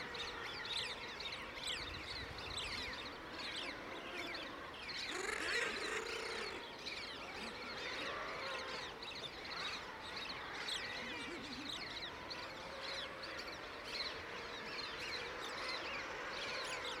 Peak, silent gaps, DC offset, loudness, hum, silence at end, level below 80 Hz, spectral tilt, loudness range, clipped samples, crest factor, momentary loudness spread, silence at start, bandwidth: -26 dBFS; none; under 0.1%; -43 LUFS; none; 0 s; -66 dBFS; -2 dB/octave; 3 LU; under 0.1%; 18 dB; 5 LU; 0 s; 16 kHz